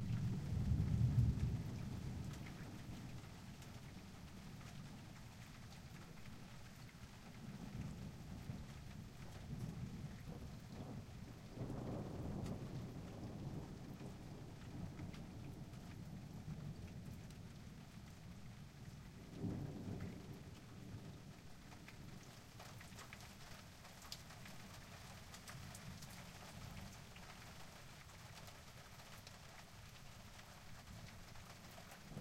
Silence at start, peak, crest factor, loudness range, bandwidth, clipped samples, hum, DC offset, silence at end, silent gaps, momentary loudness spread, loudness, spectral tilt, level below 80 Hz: 0 s; -24 dBFS; 24 dB; 7 LU; 16 kHz; under 0.1%; none; under 0.1%; 0 s; none; 11 LU; -51 LUFS; -6 dB/octave; -58 dBFS